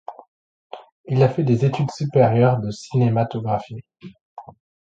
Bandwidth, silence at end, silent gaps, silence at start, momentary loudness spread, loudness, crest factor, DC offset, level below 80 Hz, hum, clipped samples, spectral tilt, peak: 7.8 kHz; 0.4 s; 0.28-0.70 s, 0.92-1.04 s, 4.21-4.37 s; 0.1 s; 24 LU; -20 LUFS; 18 dB; under 0.1%; -56 dBFS; none; under 0.1%; -8.5 dB/octave; -2 dBFS